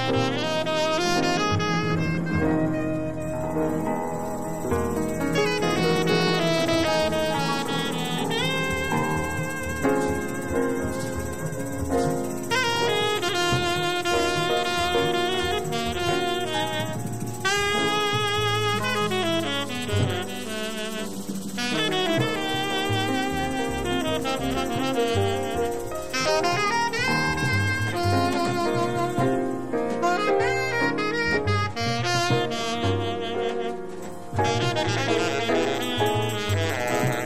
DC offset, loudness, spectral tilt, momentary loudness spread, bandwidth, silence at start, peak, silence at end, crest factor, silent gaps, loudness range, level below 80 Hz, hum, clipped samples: 1%; -24 LUFS; -4.5 dB/octave; 6 LU; 16 kHz; 0 s; -10 dBFS; 0 s; 16 dB; none; 3 LU; -44 dBFS; none; under 0.1%